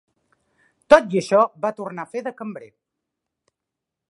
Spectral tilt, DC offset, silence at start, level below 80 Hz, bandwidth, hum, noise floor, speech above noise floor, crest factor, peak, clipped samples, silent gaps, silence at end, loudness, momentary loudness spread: -5.5 dB/octave; under 0.1%; 0.9 s; -60 dBFS; 11 kHz; none; -84 dBFS; 65 dB; 24 dB; 0 dBFS; under 0.1%; none; 1.45 s; -19 LUFS; 19 LU